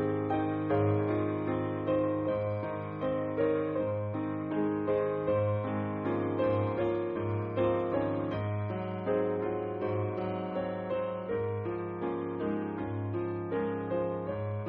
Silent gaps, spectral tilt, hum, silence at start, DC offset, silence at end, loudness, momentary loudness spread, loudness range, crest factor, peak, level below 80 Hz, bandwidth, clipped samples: none; -8 dB/octave; none; 0 s; under 0.1%; 0 s; -32 LUFS; 5 LU; 3 LU; 14 dB; -16 dBFS; -60 dBFS; 4.3 kHz; under 0.1%